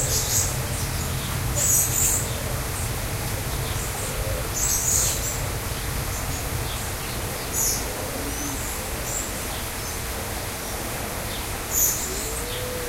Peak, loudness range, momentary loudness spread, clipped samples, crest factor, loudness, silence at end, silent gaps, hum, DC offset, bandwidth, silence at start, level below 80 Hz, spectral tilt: -8 dBFS; 5 LU; 9 LU; under 0.1%; 18 dB; -24 LUFS; 0 s; none; none; under 0.1%; 16 kHz; 0 s; -34 dBFS; -2.5 dB/octave